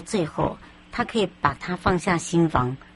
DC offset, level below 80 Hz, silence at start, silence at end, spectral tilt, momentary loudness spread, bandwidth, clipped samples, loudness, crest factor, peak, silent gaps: under 0.1%; -44 dBFS; 0 s; 0.1 s; -5.5 dB/octave; 7 LU; 11.5 kHz; under 0.1%; -24 LUFS; 20 dB; -4 dBFS; none